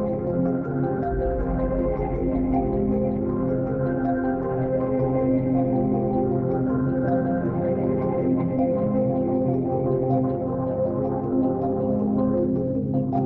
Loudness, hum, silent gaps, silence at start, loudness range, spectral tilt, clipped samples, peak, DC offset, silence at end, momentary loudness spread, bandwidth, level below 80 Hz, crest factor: -24 LUFS; none; none; 0 s; 1 LU; -13 dB/octave; under 0.1%; -12 dBFS; under 0.1%; 0 s; 3 LU; 2.9 kHz; -38 dBFS; 12 dB